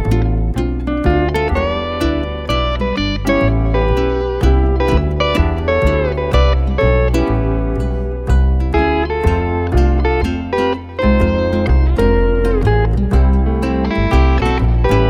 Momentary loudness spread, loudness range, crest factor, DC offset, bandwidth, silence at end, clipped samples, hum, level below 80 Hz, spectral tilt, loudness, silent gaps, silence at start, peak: 4 LU; 2 LU; 14 dB; under 0.1%; 7.6 kHz; 0 s; under 0.1%; none; -16 dBFS; -7.5 dB/octave; -16 LUFS; none; 0 s; 0 dBFS